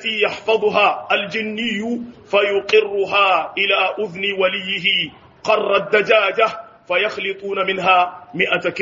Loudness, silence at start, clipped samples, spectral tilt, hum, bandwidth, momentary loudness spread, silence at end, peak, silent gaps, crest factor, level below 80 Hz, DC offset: -17 LUFS; 0 s; under 0.1%; -0.5 dB/octave; none; 7.4 kHz; 8 LU; 0 s; 0 dBFS; none; 18 dB; -62 dBFS; under 0.1%